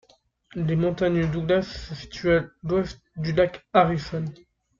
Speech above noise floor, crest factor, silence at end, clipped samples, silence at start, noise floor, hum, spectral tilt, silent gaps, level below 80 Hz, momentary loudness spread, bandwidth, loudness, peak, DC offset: 33 dB; 20 dB; 0.45 s; under 0.1%; 0.55 s; -57 dBFS; none; -7.5 dB/octave; none; -46 dBFS; 13 LU; 7.4 kHz; -24 LUFS; -4 dBFS; under 0.1%